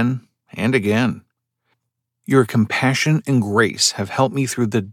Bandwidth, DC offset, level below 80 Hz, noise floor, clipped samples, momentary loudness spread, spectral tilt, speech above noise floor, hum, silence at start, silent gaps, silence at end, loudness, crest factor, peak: 16 kHz; under 0.1%; -64 dBFS; -77 dBFS; under 0.1%; 9 LU; -5 dB/octave; 59 dB; none; 0 s; none; 0 s; -18 LUFS; 18 dB; -2 dBFS